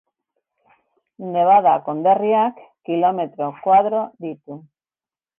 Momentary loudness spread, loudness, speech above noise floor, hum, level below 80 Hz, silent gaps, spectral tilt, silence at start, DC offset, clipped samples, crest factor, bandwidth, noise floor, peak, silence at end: 21 LU; -18 LUFS; over 72 dB; none; -66 dBFS; none; -9.5 dB/octave; 1.2 s; under 0.1%; under 0.1%; 16 dB; 3.6 kHz; under -90 dBFS; -4 dBFS; 0.8 s